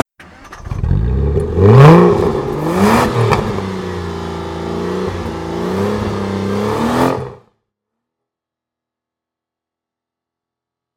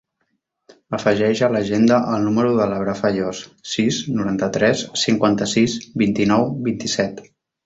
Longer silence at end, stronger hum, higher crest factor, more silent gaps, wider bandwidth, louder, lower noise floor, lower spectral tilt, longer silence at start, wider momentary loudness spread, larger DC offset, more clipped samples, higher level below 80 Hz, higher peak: first, 3.6 s vs 0.4 s; neither; about the same, 16 dB vs 16 dB; neither; first, 16.5 kHz vs 8 kHz; first, -14 LUFS vs -19 LUFS; first, -85 dBFS vs -72 dBFS; first, -7.5 dB/octave vs -5 dB/octave; second, 0.2 s vs 0.9 s; first, 16 LU vs 7 LU; neither; first, 0.6% vs under 0.1%; first, -30 dBFS vs -54 dBFS; about the same, 0 dBFS vs -2 dBFS